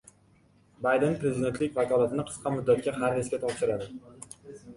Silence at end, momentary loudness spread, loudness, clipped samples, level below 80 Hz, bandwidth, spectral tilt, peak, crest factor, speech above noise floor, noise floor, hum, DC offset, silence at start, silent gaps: 0 s; 19 LU; -28 LUFS; under 0.1%; -60 dBFS; 11.5 kHz; -6 dB/octave; -12 dBFS; 16 dB; 34 dB; -62 dBFS; none; under 0.1%; 0.8 s; none